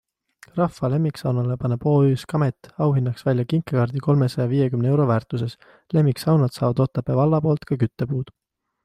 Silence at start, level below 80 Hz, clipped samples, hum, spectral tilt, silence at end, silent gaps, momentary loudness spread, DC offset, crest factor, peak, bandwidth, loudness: 0.55 s; -54 dBFS; under 0.1%; none; -8.5 dB/octave; 0.55 s; none; 7 LU; under 0.1%; 14 dB; -8 dBFS; 13.5 kHz; -22 LUFS